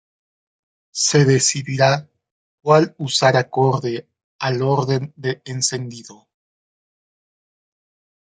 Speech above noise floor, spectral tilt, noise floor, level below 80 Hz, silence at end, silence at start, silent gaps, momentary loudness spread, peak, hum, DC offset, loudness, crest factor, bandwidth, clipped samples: over 72 dB; -4 dB/octave; under -90 dBFS; -62 dBFS; 2.15 s; 0.95 s; 2.31-2.58 s, 4.24-4.39 s; 13 LU; -2 dBFS; none; under 0.1%; -18 LUFS; 20 dB; 9.6 kHz; under 0.1%